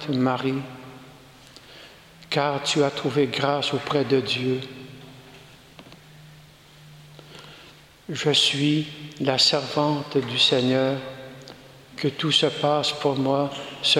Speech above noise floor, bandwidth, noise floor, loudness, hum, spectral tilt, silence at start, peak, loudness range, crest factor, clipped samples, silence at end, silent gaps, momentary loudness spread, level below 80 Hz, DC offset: 26 dB; 16 kHz; -49 dBFS; -22 LUFS; none; -4.5 dB/octave; 0 s; -6 dBFS; 8 LU; 20 dB; under 0.1%; 0 s; none; 24 LU; -62 dBFS; under 0.1%